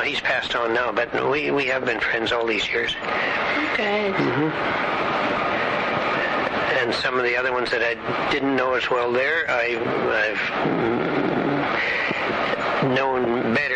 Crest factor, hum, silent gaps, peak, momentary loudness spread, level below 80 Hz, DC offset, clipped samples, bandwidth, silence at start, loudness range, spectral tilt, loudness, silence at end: 12 dB; none; none; -10 dBFS; 2 LU; -54 dBFS; under 0.1%; under 0.1%; 9.6 kHz; 0 s; 1 LU; -5 dB/octave; -22 LUFS; 0 s